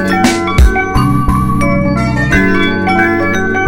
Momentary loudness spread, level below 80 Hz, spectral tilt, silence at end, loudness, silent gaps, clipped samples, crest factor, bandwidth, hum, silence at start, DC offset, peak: 2 LU; -18 dBFS; -6 dB/octave; 0 s; -11 LUFS; none; under 0.1%; 10 dB; 16.5 kHz; none; 0 s; under 0.1%; 0 dBFS